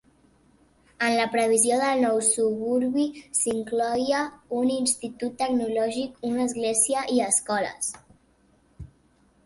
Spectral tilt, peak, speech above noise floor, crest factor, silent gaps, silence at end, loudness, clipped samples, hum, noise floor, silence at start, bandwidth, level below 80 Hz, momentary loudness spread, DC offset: -2.5 dB/octave; -6 dBFS; 38 dB; 20 dB; none; 0.6 s; -24 LUFS; under 0.1%; none; -62 dBFS; 1 s; 12 kHz; -60 dBFS; 8 LU; under 0.1%